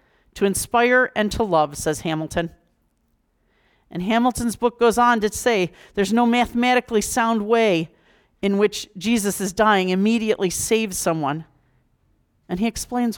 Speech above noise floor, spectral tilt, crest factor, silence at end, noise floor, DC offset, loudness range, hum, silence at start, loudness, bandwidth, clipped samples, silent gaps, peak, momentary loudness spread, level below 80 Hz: 47 dB; -4 dB/octave; 16 dB; 0 s; -67 dBFS; under 0.1%; 4 LU; none; 0.35 s; -20 LUFS; 19.5 kHz; under 0.1%; none; -6 dBFS; 9 LU; -48 dBFS